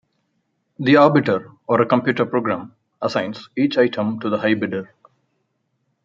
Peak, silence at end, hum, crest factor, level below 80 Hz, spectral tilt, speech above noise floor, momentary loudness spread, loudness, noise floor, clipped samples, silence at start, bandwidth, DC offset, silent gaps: -2 dBFS; 1.2 s; none; 18 dB; -66 dBFS; -7.5 dB/octave; 52 dB; 12 LU; -19 LUFS; -71 dBFS; under 0.1%; 0.8 s; 7.4 kHz; under 0.1%; none